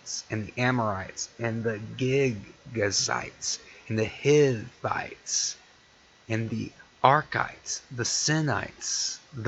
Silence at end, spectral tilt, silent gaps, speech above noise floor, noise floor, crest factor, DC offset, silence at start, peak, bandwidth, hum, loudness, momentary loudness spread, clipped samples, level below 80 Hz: 0 s; -3.5 dB/octave; none; 30 dB; -58 dBFS; 26 dB; under 0.1%; 0.05 s; -2 dBFS; 8.4 kHz; none; -28 LUFS; 11 LU; under 0.1%; -60 dBFS